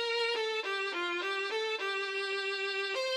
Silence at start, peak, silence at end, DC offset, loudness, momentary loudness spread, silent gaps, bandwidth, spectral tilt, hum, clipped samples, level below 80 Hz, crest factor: 0 s; -22 dBFS; 0 s; under 0.1%; -33 LUFS; 2 LU; none; 13 kHz; 0 dB/octave; none; under 0.1%; -86 dBFS; 12 dB